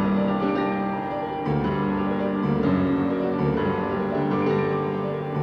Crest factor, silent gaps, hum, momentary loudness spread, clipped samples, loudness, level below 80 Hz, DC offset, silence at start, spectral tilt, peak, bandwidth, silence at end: 12 dB; none; none; 5 LU; under 0.1%; -24 LUFS; -48 dBFS; under 0.1%; 0 s; -9.5 dB/octave; -12 dBFS; 5.8 kHz; 0 s